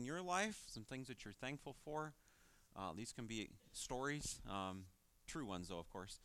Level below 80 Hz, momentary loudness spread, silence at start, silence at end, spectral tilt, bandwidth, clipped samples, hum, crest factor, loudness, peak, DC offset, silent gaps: -66 dBFS; 11 LU; 0 s; 0 s; -3.5 dB/octave; 16 kHz; under 0.1%; none; 22 dB; -48 LUFS; -26 dBFS; under 0.1%; none